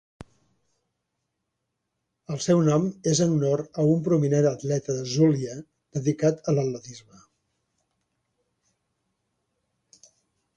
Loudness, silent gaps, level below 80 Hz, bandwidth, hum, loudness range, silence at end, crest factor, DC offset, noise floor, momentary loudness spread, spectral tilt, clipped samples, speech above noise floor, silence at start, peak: -24 LUFS; none; -62 dBFS; 9.4 kHz; none; 7 LU; 3.6 s; 18 dB; under 0.1%; -81 dBFS; 14 LU; -6.5 dB/octave; under 0.1%; 57 dB; 2.3 s; -10 dBFS